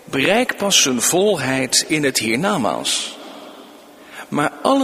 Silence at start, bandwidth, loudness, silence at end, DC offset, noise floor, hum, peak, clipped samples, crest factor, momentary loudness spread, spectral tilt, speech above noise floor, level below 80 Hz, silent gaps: 0.05 s; 15.5 kHz; -17 LUFS; 0 s; under 0.1%; -42 dBFS; none; 0 dBFS; under 0.1%; 18 dB; 21 LU; -2.5 dB/octave; 24 dB; -58 dBFS; none